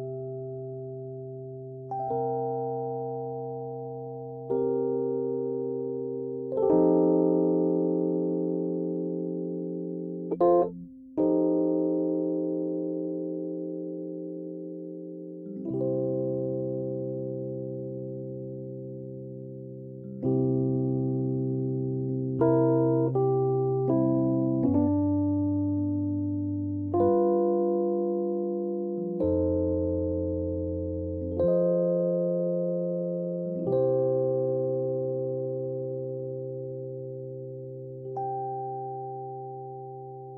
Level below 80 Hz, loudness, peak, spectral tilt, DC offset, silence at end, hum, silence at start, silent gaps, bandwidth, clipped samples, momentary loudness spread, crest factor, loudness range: -56 dBFS; -29 LUFS; -12 dBFS; -14.5 dB/octave; under 0.1%; 0 s; none; 0 s; none; 2 kHz; under 0.1%; 14 LU; 16 dB; 9 LU